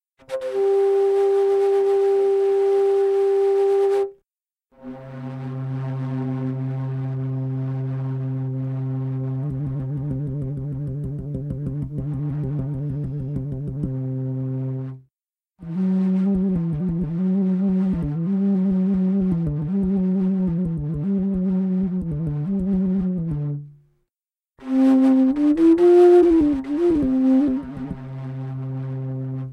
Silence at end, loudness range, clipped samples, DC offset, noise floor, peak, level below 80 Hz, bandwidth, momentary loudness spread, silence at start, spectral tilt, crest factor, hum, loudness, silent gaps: 0 s; 11 LU; under 0.1%; under 0.1%; under -90 dBFS; -6 dBFS; -44 dBFS; 8.6 kHz; 12 LU; 0.3 s; -10 dB/octave; 16 dB; none; -21 LUFS; none